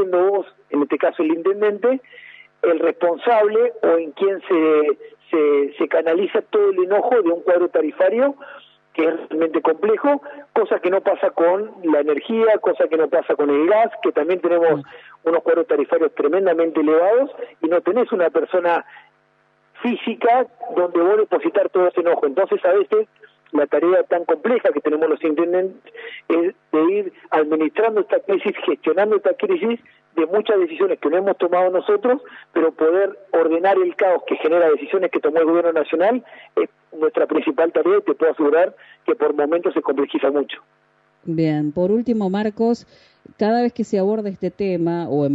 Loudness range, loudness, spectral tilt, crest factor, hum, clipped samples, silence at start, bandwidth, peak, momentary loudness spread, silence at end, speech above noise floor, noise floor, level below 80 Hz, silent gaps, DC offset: 3 LU; -19 LUFS; -8 dB/octave; 12 dB; none; under 0.1%; 0 s; 7.6 kHz; -6 dBFS; 7 LU; 0 s; 42 dB; -60 dBFS; -70 dBFS; none; under 0.1%